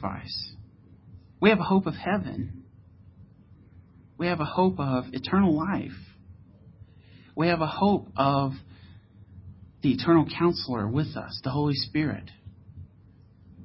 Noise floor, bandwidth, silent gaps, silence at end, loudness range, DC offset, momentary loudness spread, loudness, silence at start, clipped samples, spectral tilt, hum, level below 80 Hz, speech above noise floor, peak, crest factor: -54 dBFS; 5.8 kHz; none; 0 s; 3 LU; under 0.1%; 18 LU; -26 LUFS; 0 s; under 0.1%; -10.5 dB/octave; none; -52 dBFS; 29 dB; -6 dBFS; 22 dB